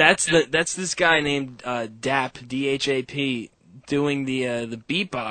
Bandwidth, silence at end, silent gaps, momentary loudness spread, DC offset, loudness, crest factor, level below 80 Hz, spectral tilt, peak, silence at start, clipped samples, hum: 9.4 kHz; 0 s; none; 10 LU; under 0.1%; -23 LUFS; 24 dB; -58 dBFS; -3.5 dB/octave; 0 dBFS; 0 s; under 0.1%; none